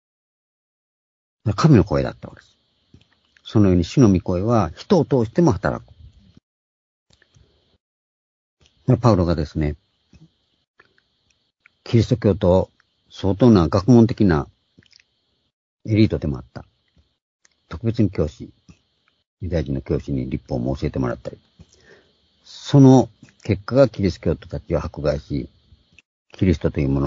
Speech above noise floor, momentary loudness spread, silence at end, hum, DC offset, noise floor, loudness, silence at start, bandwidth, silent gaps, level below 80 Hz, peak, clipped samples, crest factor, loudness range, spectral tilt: 51 dB; 18 LU; 0 s; none; under 0.1%; -69 dBFS; -19 LUFS; 1.45 s; 7.6 kHz; 6.43-7.06 s, 7.80-8.57 s, 10.67-10.74 s, 15.53-15.79 s, 17.22-17.39 s, 19.27-19.37 s, 26.05-26.25 s; -40 dBFS; 0 dBFS; under 0.1%; 20 dB; 8 LU; -8 dB/octave